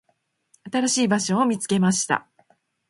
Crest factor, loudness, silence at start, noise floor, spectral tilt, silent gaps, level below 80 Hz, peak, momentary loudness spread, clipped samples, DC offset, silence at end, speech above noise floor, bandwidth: 20 dB; -22 LUFS; 0.65 s; -70 dBFS; -4 dB/octave; none; -66 dBFS; -4 dBFS; 5 LU; under 0.1%; under 0.1%; 0.7 s; 49 dB; 11.5 kHz